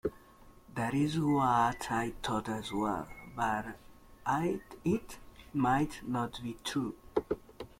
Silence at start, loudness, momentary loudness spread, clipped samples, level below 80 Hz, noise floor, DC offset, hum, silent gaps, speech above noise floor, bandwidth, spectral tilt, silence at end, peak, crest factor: 0.05 s; -34 LUFS; 11 LU; under 0.1%; -56 dBFS; -57 dBFS; under 0.1%; none; none; 25 dB; 16.5 kHz; -6 dB/octave; 0.15 s; -16 dBFS; 18 dB